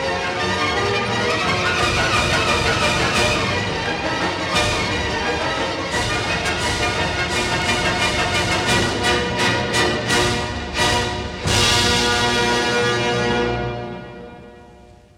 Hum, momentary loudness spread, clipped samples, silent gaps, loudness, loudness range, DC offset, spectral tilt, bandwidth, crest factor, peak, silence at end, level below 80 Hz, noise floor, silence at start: none; 5 LU; under 0.1%; none; -18 LUFS; 2 LU; under 0.1%; -3.5 dB/octave; 17 kHz; 16 dB; -4 dBFS; 0.35 s; -36 dBFS; -45 dBFS; 0 s